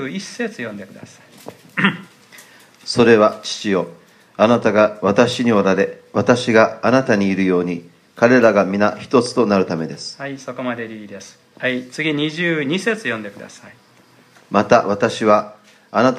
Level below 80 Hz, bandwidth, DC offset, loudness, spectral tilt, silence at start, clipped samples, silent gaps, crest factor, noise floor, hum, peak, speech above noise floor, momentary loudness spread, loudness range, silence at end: -62 dBFS; 13 kHz; under 0.1%; -17 LUFS; -5.5 dB/octave; 0 s; under 0.1%; none; 18 dB; -50 dBFS; none; 0 dBFS; 33 dB; 16 LU; 7 LU; 0 s